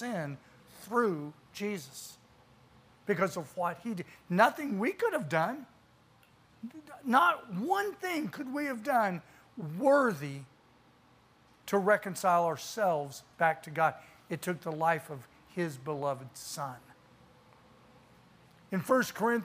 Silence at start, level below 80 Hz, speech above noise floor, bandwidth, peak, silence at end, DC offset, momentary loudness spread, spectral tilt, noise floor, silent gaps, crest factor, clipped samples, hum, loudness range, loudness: 0 s; -76 dBFS; 32 dB; 15.5 kHz; -10 dBFS; 0 s; under 0.1%; 18 LU; -5 dB/octave; -63 dBFS; none; 22 dB; under 0.1%; none; 6 LU; -32 LUFS